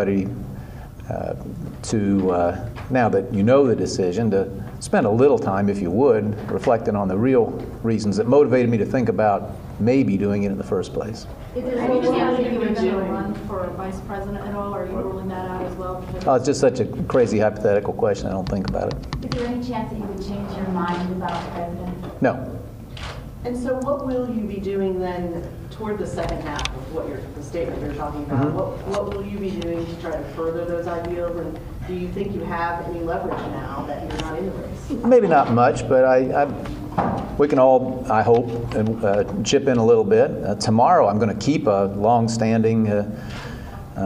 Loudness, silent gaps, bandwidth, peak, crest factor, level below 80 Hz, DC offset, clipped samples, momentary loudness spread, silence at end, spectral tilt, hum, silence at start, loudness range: -21 LUFS; none; 15.5 kHz; -2 dBFS; 18 dB; -40 dBFS; under 0.1%; under 0.1%; 14 LU; 0 s; -6.5 dB/octave; none; 0 s; 9 LU